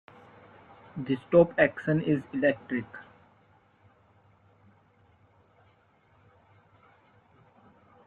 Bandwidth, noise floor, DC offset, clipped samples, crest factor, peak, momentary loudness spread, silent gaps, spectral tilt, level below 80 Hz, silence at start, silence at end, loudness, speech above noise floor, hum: 4.4 kHz; -64 dBFS; under 0.1%; under 0.1%; 24 dB; -8 dBFS; 21 LU; none; -9.5 dB/octave; -66 dBFS; 0.95 s; 5.05 s; -27 LUFS; 38 dB; none